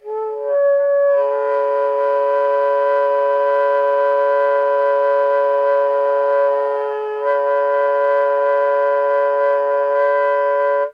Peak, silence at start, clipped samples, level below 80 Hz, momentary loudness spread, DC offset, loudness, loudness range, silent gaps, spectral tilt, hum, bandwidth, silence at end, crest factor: -8 dBFS; 0.05 s; under 0.1%; -84 dBFS; 2 LU; under 0.1%; -16 LUFS; 1 LU; none; -3.5 dB/octave; none; 5.2 kHz; 0 s; 8 dB